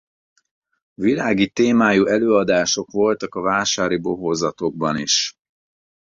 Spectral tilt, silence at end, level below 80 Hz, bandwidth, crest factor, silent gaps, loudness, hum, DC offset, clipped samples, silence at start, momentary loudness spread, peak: -3.5 dB/octave; 0.8 s; -56 dBFS; 7.6 kHz; 18 dB; none; -19 LUFS; none; under 0.1%; under 0.1%; 1 s; 7 LU; -2 dBFS